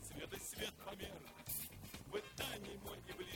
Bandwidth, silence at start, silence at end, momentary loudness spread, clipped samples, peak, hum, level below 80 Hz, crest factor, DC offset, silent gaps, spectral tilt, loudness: 18 kHz; 0 s; 0 s; 6 LU; under 0.1%; -28 dBFS; none; -64 dBFS; 20 dB; under 0.1%; none; -3 dB/octave; -48 LUFS